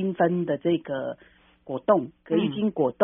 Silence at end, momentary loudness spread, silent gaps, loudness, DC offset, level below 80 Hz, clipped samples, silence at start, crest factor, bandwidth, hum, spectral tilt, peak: 0 s; 11 LU; none; -26 LUFS; under 0.1%; -66 dBFS; under 0.1%; 0 s; 20 dB; 3.7 kHz; none; -5 dB/octave; -6 dBFS